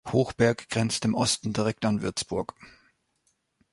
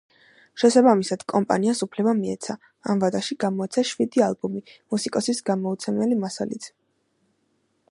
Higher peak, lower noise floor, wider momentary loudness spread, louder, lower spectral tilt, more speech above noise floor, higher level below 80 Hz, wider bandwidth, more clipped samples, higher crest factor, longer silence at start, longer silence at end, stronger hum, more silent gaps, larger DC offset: second, -8 dBFS vs -4 dBFS; about the same, -73 dBFS vs -70 dBFS; second, 7 LU vs 13 LU; second, -27 LUFS vs -23 LUFS; about the same, -4.5 dB/octave vs -5 dB/octave; about the same, 46 dB vs 47 dB; first, -56 dBFS vs -70 dBFS; about the same, 11.5 kHz vs 11.5 kHz; neither; about the same, 20 dB vs 20 dB; second, 0.05 s vs 0.55 s; second, 1.05 s vs 1.2 s; neither; neither; neither